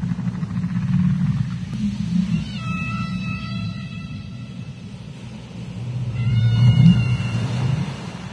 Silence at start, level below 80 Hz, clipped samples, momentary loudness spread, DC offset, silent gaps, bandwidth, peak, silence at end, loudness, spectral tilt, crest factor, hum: 0 s; -40 dBFS; under 0.1%; 19 LU; under 0.1%; none; 10 kHz; -2 dBFS; 0 s; -21 LUFS; -7.5 dB/octave; 18 dB; none